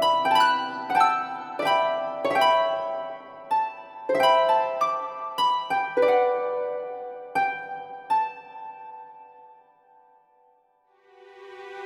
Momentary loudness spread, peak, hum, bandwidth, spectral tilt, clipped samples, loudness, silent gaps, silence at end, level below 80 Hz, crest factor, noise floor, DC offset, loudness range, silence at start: 20 LU; -8 dBFS; none; 17.5 kHz; -3 dB/octave; under 0.1%; -24 LUFS; none; 0 s; -76 dBFS; 18 dB; -64 dBFS; under 0.1%; 9 LU; 0 s